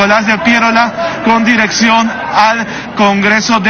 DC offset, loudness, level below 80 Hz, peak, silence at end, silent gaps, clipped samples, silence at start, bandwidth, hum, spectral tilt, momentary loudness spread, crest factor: under 0.1%; -10 LUFS; -44 dBFS; 0 dBFS; 0 s; none; 0.2%; 0 s; 6.8 kHz; none; -3.5 dB/octave; 5 LU; 10 dB